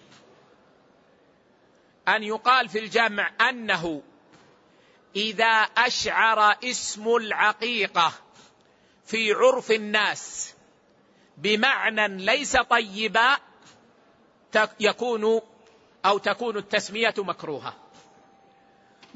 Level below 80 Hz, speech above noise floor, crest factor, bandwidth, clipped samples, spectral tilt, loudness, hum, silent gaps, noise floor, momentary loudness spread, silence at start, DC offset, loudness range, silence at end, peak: -62 dBFS; 36 dB; 20 dB; 8 kHz; under 0.1%; -2 dB/octave; -23 LUFS; none; none; -60 dBFS; 10 LU; 2.05 s; under 0.1%; 4 LU; 1.45 s; -6 dBFS